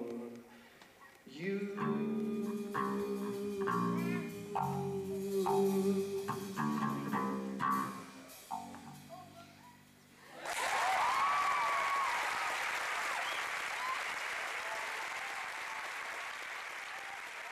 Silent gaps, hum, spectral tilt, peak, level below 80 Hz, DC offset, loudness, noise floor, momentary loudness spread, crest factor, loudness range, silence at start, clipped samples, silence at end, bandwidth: none; none; -4.5 dB/octave; -22 dBFS; -76 dBFS; under 0.1%; -36 LUFS; -61 dBFS; 18 LU; 16 dB; 6 LU; 0 s; under 0.1%; 0 s; 15 kHz